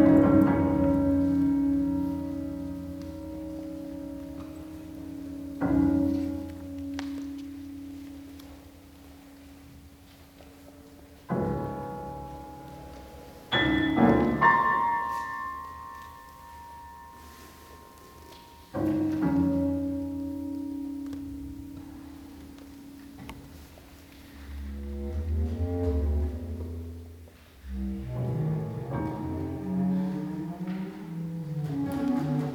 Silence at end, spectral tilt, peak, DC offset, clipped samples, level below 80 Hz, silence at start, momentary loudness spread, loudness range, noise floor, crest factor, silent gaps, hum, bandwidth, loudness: 0 s; -7.5 dB/octave; -8 dBFS; under 0.1%; under 0.1%; -42 dBFS; 0 s; 24 LU; 17 LU; -52 dBFS; 22 dB; none; none; 19 kHz; -29 LUFS